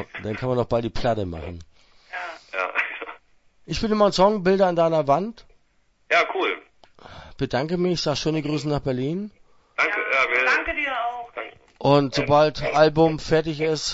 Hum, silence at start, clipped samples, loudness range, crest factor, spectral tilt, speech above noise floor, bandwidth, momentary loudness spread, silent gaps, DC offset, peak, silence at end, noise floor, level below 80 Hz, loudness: none; 0 s; under 0.1%; 6 LU; 20 dB; -5.5 dB/octave; 42 dB; 8 kHz; 15 LU; none; under 0.1%; -4 dBFS; 0 s; -63 dBFS; -46 dBFS; -22 LUFS